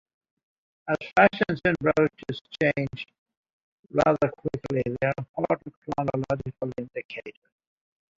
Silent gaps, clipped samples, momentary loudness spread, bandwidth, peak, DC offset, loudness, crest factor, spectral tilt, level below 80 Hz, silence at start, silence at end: 2.41-2.45 s, 3.18-3.26 s, 3.37-3.43 s, 3.53-3.83 s, 5.29-5.34 s, 5.77-5.82 s, 7.05-7.09 s; under 0.1%; 15 LU; 7.6 kHz; -4 dBFS; under 0.1%; -26 LUFS; 24 dB; -7.5 dB/octave; -56 dBFS; 0.85 s; 0.9 s